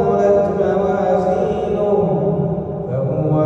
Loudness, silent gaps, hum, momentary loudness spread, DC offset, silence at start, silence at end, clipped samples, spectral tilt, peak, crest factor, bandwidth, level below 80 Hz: -17 LUFS; none; none; 7 LU; under 0.1%; 0 s; 0 s; under 0.1%; -9.5 dB/octave; -4 dBFS; 12 dB; 7.6 kHz; -42 dBFS